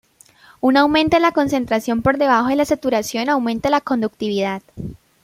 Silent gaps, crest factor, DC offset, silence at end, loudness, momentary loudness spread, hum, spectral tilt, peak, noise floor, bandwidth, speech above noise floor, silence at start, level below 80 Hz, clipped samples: none; 18 dB; under 0.1%; 0.3 s; -18 LUFS; 9 LU; none; -5 dB/octave; -2 dBFS; -50 dBFS; 16 kHz; 32 dB; 0.65 s; -48 dBFS; under 0.1%